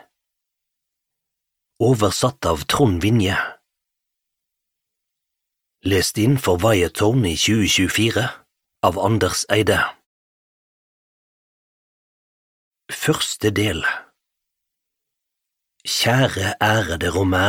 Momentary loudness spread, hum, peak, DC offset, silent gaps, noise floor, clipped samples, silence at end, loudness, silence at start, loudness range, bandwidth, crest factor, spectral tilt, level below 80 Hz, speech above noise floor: 7 LU; none; 0 dBFS; under 0.1%; 10.06-12.72 s; -81 dBFS; under 0.1%; 0 s; -19 LUFS; 1.8 s; 7 LU; 17 kHz; 20 dB; -4.5 dB/octave; -44 dBFS; 63 dB